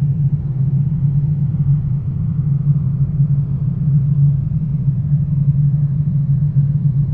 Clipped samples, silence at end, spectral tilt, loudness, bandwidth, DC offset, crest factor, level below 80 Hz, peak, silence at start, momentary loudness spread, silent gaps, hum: under 0.1%; 0 s; -14 dB/octave; -17 LUFS; 1.4 kHz; under 0.1%; 10 dB; -32 dBFS; -4 dBFS; 0 s; 3 LU; none; none